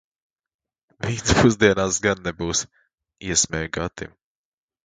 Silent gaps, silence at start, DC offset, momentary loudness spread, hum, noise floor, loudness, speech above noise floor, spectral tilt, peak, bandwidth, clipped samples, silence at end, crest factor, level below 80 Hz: none; 1 s; under 0.1%; 18 LU; none; under -90 dBFS; -21 LUFS; over 69 dB; -3.5 dB/octave; 0 dBFS; 10 kHz; under 0.1%; 0.8 s; 24 dB; -40 dBFS